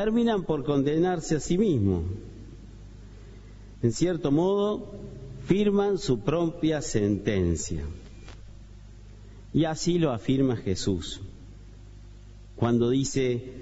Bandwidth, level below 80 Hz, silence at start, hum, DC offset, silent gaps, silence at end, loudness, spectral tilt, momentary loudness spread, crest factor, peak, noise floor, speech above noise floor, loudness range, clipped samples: 8 kHz; -44 dBFS; 0 s; none; under 0.1%; none; 0 s; -26 LUFS; -6 dB/octave; 23 LU; 18 dB; -10 dBFS; -46 dBFS; 21 dB; 3 LU; under 0.1%